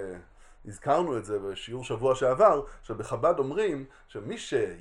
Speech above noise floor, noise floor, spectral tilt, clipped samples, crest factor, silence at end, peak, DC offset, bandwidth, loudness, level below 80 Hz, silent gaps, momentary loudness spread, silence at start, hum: 22 dB; -49 dBFS; -5.5 dB/octave; under 0.1%; 20 dB; 0 s; -8 dBFS; under 0.1%; 11.5 kHz; -28 LUFS; -52 dBFS; none; 18 LU; 0 s; none